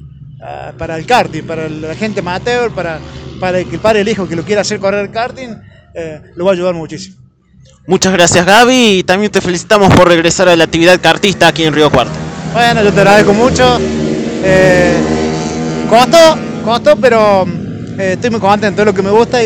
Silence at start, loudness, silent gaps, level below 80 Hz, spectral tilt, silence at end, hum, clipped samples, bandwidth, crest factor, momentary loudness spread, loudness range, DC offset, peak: 0 s; -10 LUFS; none; -34 dBFS; -4.5 dB/octave; 0 s; none; 2%; over 20 kHz; 10 dB; 15 LU; 8 LU; under 0.1%; 0 dBFS